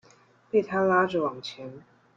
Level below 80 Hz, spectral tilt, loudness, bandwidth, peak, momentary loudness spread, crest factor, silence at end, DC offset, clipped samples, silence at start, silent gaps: -70 dBFS; -6.5 dB/octave; -25 LUFS; 7.4 kHz; -10 dBFS; 18 LU; 18 dB; 0.4 s; under 0.1%; under 0.1%; 0.55 s; none